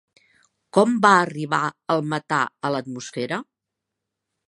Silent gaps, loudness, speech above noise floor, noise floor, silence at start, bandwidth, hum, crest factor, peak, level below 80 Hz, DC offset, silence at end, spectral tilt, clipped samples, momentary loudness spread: none; -22 LUFS; 62 dB; -83 dBFS; 0.75 s; 11.5 kHz; none; 22 dB; -2 dBFS; -72 dBFS; under 0.1%; 1.05 s; -5 dB/octave; under 0.1%; 13 LU